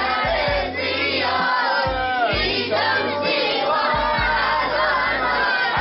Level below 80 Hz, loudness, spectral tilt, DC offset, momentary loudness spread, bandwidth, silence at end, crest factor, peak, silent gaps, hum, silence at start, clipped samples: -38 dBFS; -19 LUFS; -0.5 dB/octave; under 0.1%; 2 LU; 6 kHz; 0 s; 12 dB; -8 dBFS; none; none; 0 s; under 0.1%